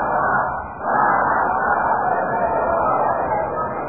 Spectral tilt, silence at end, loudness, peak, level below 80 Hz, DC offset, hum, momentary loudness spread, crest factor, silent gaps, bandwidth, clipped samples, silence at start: 0.5 dB/octave; 0 s; -19 LUFS; -6 dBFS; -44 dBFS; 0.4%; none; 5 LU; 14 dB; none; 2.6 kHz; under 0.1%; 0 s